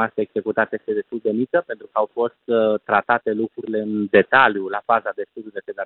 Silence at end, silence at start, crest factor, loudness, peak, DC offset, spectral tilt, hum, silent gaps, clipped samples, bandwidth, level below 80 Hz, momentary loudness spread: 0 s; 0 s; 20 dB; -20 LUFS; -2 dBFS; under 0.1%; -10 dB/octave; none; none; under 0.1%; 4.3 kHz; -66 dBFS; 11 LU